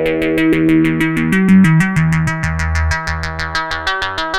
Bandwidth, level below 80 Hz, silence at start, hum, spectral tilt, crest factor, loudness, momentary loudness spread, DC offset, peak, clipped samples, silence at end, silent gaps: 14 kHz; -28 dBFS; 0 s; none; -6.5 dB/octave; 14 dB; -14 LUFS; 9 LU; under 0.1%; 0 dBFS; under 0.1%; 0 s; none